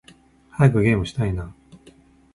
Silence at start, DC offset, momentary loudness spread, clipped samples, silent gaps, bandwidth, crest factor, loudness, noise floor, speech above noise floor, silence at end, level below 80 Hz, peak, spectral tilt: 0.55 s; under 0.1%; 20 LU; under 0.1%; none; 11.5 kHz; 18 dB; -21 LUFS; -52 dBFS; 33 dB; 0.8 s; -40 dBFS; -4 dBFS; -8 dB/octave